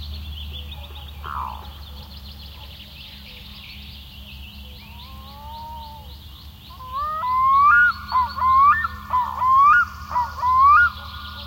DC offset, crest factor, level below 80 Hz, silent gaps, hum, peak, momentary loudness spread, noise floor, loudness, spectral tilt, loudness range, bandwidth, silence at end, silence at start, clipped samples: under 0.1%; 16 dB; -40 dBFS; none; none; -6 dBFS; 25 LU; -40 dBFS; -17 LUFS; -4 dB/octave; 21 LU; 16.5 kHz; 0 s; 0 s; under 0.1%